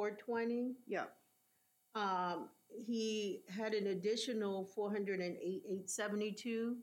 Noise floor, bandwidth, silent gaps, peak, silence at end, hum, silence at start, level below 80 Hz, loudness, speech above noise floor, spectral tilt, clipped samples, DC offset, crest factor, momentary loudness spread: -77 dBFS; 16.5 kHz; none; -26 dBFS; 0 s; none; 0 s; under -90 dBFS; -41 LUFS; 37 dB; -4 dB/octave; under 0.1%; under 0.1%; 14 dB; 6 LU